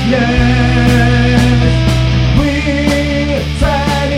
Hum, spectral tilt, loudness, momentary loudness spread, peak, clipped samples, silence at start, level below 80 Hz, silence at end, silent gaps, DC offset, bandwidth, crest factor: none; -6.5 dB/octave; -11 LUFS; 4 LU; 0 dBFS; under 0.1%; 0 s; -18 dBFS; 0 s; none; under 0.1%; 14 kHz; 10 dB